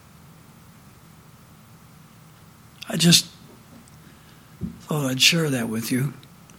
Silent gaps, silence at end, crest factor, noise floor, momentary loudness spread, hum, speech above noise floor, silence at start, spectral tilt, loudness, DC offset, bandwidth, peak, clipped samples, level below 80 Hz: none; 0.4 s; 26 dB; -49 dBFS; 21 LU; none; 28 dB; 2.8 s; -3 dB/octave; -20 LUFS; under 0.1%; 17.5 kHz; 0 dBFS; under 0.1%; -58 dBFS